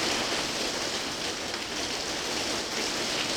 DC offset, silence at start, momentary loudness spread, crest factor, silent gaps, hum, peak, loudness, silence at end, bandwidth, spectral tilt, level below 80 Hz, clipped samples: under 0.1%; 0 s; 3 LU; 16 dB; none; none; -14 dBFS; -29 LUFS; 0 s; over 20 kHz; -1.5 dB/octave; -54 dBFS; under 0.1%